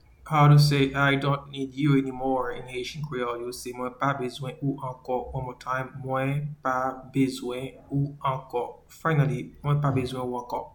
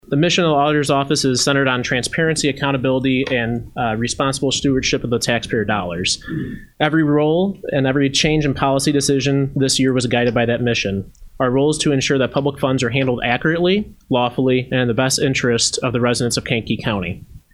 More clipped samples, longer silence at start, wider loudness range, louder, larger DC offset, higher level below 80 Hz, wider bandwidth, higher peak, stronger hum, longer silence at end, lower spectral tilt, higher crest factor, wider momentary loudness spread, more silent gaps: neither; first, 0.25 s vs 0.1 s; first, 7 LU vs 2 LU; second, -27 LUFS vs -18 LUFS; neither; second, -52 dBFS vs -42 dBFS; first, 18.5 kHz vs 13.5 kHz; second, -8 dBFS vs 0 dBFS; neither; about the same, 0.05 s vs 0.15 s; first, -7 dB/octave vs -4.5 dB/octave; about the same, 20 dB vs 18 dB; first, 12 LU vs 6 LU; neither